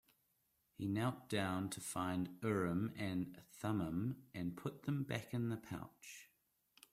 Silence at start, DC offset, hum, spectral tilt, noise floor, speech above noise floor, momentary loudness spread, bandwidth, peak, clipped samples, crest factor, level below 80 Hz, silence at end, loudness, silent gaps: 0.8 s; under 0.1%; none; -6 dB/octave; -81 dBFS; 40 dB; 10 LU; 16 kHz; -24 dBFS; under 0.1%; 20 dB; -72 dBFS; 0.65 s; -42 LUFS; none